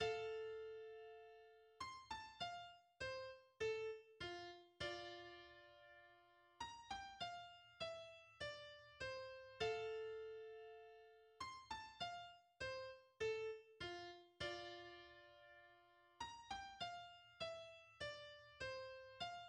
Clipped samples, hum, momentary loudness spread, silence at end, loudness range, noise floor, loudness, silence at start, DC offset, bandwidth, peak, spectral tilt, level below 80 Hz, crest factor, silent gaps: under 0.1%; none; 16 LU; 0 s; 4 LU; -72 dBFS; -52 LUFS; 0 s; under 0.1%; 11 kHz; -32 dBFS; -3.5 dB/octave; -76 dBFS; 22 dB; none